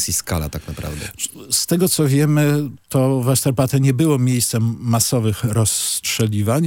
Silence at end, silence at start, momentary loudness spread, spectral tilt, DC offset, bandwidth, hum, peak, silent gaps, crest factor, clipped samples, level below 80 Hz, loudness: 0 s; 0 s; 10 LU; -5 dB/octave; under 0.1%; 17 kHz; none; -2 dBFS; none; 16 dB; under 0.1%; -44 dBFS; -18 LUFS